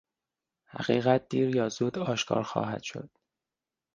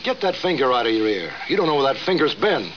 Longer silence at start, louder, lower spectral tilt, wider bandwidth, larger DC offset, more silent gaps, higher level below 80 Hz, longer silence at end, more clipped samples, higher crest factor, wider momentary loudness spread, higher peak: first, 0.75 s vs 0 s; second, -29 LUFS vs -20 LUFS; about the same, -5.5 dB/octave vs -5.5 dB/octave; first, 10 kHz vs 5.4 kHz; second, under 0.1% vs 0.3%; neither; second, -68 dBFS vs -58 dBFS; first, 0.9 s vs 0 s; neither; first, 22 dB vs 12 dB; first, 13 LU vs 4 LU; about the same, -10 dBFS vs -8 dBFS